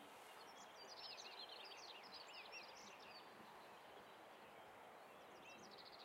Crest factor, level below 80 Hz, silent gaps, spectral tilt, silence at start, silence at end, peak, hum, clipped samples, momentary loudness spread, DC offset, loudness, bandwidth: 16 dB; under -90 dBFS; none; -1.5 dB/octave; 0 s; 0 s; -44 dBFS; none; under 0.1%; 7 LU; under 0.1%; -58 LUFS; 16 kHz